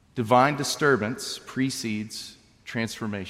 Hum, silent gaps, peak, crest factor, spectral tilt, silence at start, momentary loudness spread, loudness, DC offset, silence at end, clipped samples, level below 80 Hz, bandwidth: none; none; -6 dBFS; 20 dB; -4.5 dB/octave; 0.15 s; 16 LU; -25 LUFS; under 0.1%; 0 s; under 0.1%; -64 dBFS; 16 kHz